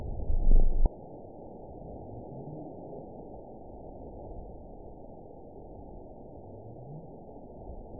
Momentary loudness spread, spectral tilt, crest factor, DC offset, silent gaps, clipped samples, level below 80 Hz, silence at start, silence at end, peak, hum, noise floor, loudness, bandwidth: 16 LU; -15.5 dB/octave; 20 dB; 0.2%; none; under 0.1%; -32 dBFS; 0 s; 0.05 s; -10 dBFS; none; -48 dBFS; -40 LUFS; 1 kHz